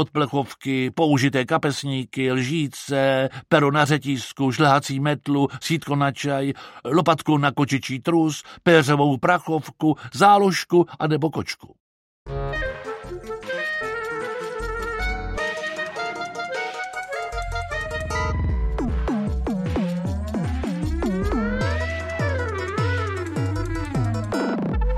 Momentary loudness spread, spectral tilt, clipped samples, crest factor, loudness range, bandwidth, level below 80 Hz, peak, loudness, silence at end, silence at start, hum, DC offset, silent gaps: 10 LU; -6 dB/octave; under 0.1%; 20 dB; 8 LU; 15.5 kHz; -34 dBFS; -2 dBFS; -23 LUFS; 0 s; 0 s; none; under 0.1%; 11.80-12.26 s